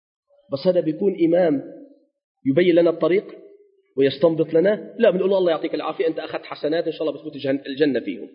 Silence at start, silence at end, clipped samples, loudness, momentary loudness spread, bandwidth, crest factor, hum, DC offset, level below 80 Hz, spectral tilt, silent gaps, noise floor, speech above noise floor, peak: 0.5 s; 0.1 s; under 0.1%; -21 LUFS; 11 LU; 5.4 kHz; 18 dB; none; under 0.1%; -72 dBFS; -11 dB/octave; 2.24-2.35 s; -52 dBFS; 32 dB; -4 dBFS